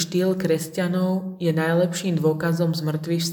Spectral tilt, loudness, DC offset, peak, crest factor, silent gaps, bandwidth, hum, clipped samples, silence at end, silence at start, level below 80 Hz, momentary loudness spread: -6 dB/octave; -23 LUFS; under 0.1%; -8 dBFS; 14 dB; none; 19 kHz; none; under 0.1%; 0 s; 0 s; -64 dBFS; 4 LU